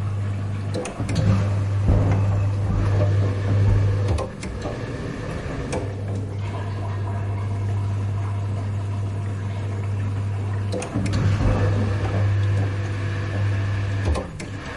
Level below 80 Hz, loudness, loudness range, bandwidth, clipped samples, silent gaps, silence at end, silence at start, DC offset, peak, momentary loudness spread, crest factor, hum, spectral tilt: -34 dBFS; -24 LUFS; 6 LU; 11 kHz; under 0.1%; none; 0 s; 0 s; under 0.1%; -6 dBFS; 8 LU; 16 dB; none; -7.5 dB/octave